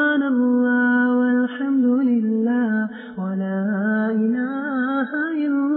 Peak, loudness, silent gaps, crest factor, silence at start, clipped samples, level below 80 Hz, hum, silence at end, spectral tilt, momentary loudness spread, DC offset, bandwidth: -10 dBFS; -20 LUFS; none; 10 dB; 0 s; under 0.1%; -76 dBFS; none; 0 s; -11 dB/octave; 7 LU; under 0.1%; 4.1 kHz